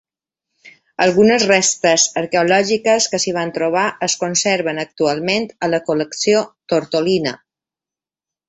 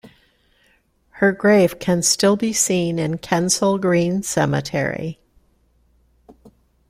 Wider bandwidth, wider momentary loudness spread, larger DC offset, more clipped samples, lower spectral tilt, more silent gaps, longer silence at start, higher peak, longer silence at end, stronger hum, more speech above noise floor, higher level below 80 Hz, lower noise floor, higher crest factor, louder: second, 8.4 kHz vs 16 kHz; about the same, 7 LU vs 8 LU; neither; neither; about the same, -3 dB/octave vs -4 dB/octave; neither; first, 0.65 s vs 0.05 s; about the same, -2 dBFS vs -2 dBFS; first, 1.1 s vs 0.4 s; neither; first, 73 dB vs 42 dB; second, -60 dBFS vs -54 dBFS; first, -90 dBFS vs -60 dBFS; about the same, 16 dB vs 18 dB; about the same, -16 LUFS vs -18 LUFS